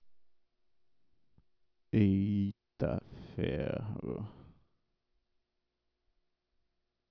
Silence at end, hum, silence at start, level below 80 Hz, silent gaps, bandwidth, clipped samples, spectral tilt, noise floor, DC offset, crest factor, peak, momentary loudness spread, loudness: 2.7 s; none; 0.05 s; -58 dBFS; none; 5.4 kHz; under 0.1%; -10.5 dB/octave; -83 dBFS; under 0.1%; 20 dB; -18 dBFS; 13 LU; -35 LUFS